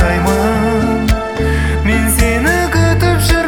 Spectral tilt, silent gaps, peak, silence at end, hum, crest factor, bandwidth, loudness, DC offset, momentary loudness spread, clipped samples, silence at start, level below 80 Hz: -5.5 dB/octave; none; 0 dBFS; 0 s; none; 12 dB; 18 kHz; -13 LUFS; under 0.1%; 3 LU; under 0.1%; 0 s; -18 dBFS